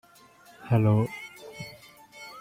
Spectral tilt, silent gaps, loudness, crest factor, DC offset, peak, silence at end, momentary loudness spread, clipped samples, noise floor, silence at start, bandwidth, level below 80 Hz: -8 dB/octave; none; -25 LUFS; 18 dB; under 0.1%; -10 dBFS; 0 s; 25 LU; under 0.1%; -55 dBFS; 0.65 s; 15 kHz; -60 dBFS